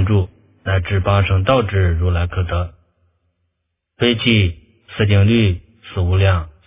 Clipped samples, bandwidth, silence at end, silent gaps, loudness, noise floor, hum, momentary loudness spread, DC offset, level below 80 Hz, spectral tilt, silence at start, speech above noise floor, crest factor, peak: under 0.1%; 3.8 kHz; 0.15 s; none; -17 LUFS; -74 dBFS; none; 14 LU; under 0.1%; -26 dBFS; -11 dB/octave; 0 s; 59 dB; 16 dB; 0 dBFS